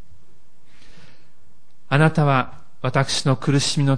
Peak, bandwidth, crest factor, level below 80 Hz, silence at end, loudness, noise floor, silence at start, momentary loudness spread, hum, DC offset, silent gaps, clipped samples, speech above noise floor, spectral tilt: -2 dBFS; 10.5 kHz; 20 dB; -54 dBFS; 0 s; -20 LUFS; -60 dBFS; 1.9 s; 7 LU; none; 3%; none; under 0.1%; 41 dB; -5 dB/octave